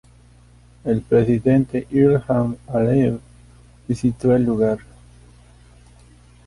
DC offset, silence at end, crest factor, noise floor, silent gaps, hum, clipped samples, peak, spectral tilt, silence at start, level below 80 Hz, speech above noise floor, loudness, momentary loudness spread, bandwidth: under 0.1%; 1.7 s; 16 dB; -49 dBFS; none; 60 Hz at -35 dBFS; under 0.1%; -4 dBFS; -9.5 dB/octave; 0.85 s; -46 dBFS; 31 dB; -19 LUFS; 8 LU; 11.5 kHz